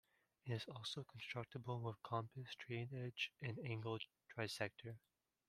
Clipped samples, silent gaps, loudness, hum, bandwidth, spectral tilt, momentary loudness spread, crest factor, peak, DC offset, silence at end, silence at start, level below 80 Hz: under 0.1%; none; -48 LUFS; none; 14 kHz; -5.5 dB/octave; 8 LU; 24 dB; -26 dBFS; under 0.1%; 0.5 s; 0.45 s; -82 dBFS